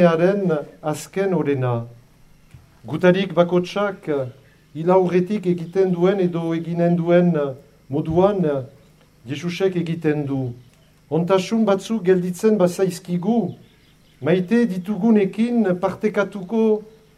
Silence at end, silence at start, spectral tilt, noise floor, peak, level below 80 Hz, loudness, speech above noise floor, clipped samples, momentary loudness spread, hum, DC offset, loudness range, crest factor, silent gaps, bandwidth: 0.3 s; 0 s; -7.5 dB/octave; -53 dBFS; -2 dBFS; -56 dBFS; -20 LUFS; 34 dB; under 0.1%; 11 LU; none; under 0.1%; 3 LU; 18 dB; none; 13.5 kHz